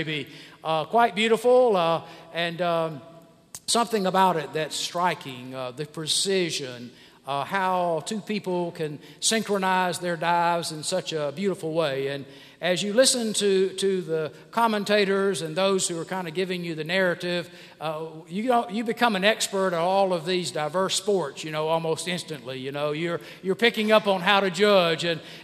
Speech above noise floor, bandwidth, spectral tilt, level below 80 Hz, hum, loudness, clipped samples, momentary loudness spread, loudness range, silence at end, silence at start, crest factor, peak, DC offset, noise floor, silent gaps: 22 dB; 15.5 kHz; -3.5 dB/octave; -72 dBFS; none; -25 LUFS; under 0.1%; 13 LU; 4 LU; 0 s; 0 s; 22 dB; -2 dBFS; under 0.1%; -47 dBFS; none